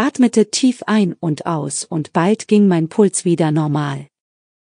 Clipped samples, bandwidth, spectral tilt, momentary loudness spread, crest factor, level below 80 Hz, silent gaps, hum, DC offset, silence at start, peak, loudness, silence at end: under 0.1%; 10.5 kHz; -5.5 dB/octave; 8 LU; 16 dB; -70 dBFS; none; none; under 0.1%; 0 s; -2 dBFS; -16 LUFS; 0.75 s